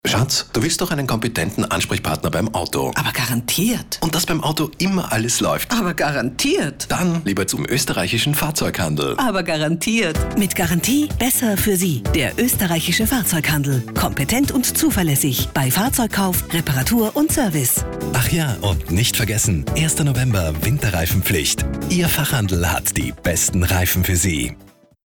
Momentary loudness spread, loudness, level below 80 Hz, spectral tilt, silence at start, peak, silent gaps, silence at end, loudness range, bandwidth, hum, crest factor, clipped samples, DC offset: 4 LU; -18 LUFS; -34 dBFS; -4 dB/octave; 0.05 s; -8 dBFS; none; 0.4 s; 2 LU; over 20 kHz; none; 12 dB; under 0.1%; under 0.1%